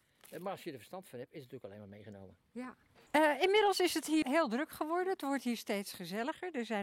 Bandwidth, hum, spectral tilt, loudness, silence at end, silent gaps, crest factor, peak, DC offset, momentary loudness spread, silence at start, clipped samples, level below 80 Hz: 16.5 kHz; none; -3.5 dB/octave; -34 LUFS; 0 s; none; 20 dB; -16 dBFS; under 0.1%; 22 LU; 0.3 s; under 0.1%; -76 dBFS